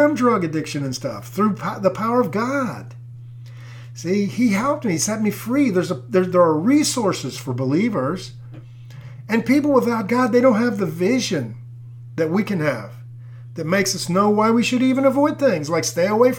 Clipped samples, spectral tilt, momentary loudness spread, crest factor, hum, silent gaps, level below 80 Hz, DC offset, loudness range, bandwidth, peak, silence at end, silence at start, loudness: under 0.1%; -5.5 dB/octave; 22 LU; 16 dB; none; none; -58 dBFS; under 0.1%; 4 LU; 18 kHz; -4 dBFS; 0 s; 0 s; -19 LUFS